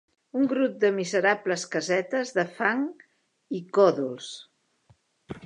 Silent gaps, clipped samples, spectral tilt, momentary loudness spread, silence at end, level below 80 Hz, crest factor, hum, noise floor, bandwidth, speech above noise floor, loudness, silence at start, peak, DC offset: none; under 0.1%; -4.5 dB/octave; 14 LU; 0 s; -70 dBFS; 20 dB; none; -64 dBFS; 10.5 kHz; 38 dB; -26 LUFS; 0.35 s; -6 dBFS; under 0.1%